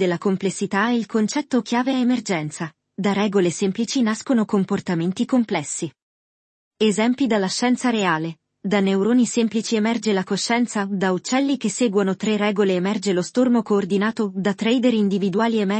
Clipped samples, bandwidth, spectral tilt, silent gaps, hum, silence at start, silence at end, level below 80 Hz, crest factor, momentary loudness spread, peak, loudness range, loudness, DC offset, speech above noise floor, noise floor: under 0.1%; 8.8 kHz; -5 dB/octave; 6.02-6.71 s; none; 0 s; 0 s; -68 dBFS; 16 dB; 5 LU; -4 dBFS; 2 LU; -21 LUFS; under 0.1%; over 70 dB; under -90 dBFS